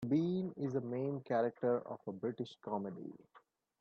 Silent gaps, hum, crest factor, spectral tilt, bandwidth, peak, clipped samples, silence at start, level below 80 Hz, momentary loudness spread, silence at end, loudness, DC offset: none; none; 16 dB; -9 dB/octave; 7.4 kHz; -22 dBFS; under 0.1%; 0 s; -80 dBFS; 11 LU; 0.45 s; -39 LUFS; under 0.1%